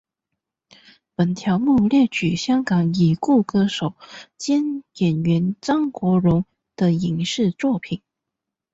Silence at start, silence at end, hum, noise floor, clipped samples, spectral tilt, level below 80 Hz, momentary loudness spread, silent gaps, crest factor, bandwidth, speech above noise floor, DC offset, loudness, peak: 1.2 s; 0.75 s; none; -84 dBFS; under 0.1%; -6.5 dB/octave; -54 dBFS; 11 LU; none; 14 dB; 8 kHz; 64 dB; under 0.1%; -20 LUFS; -6 dBFS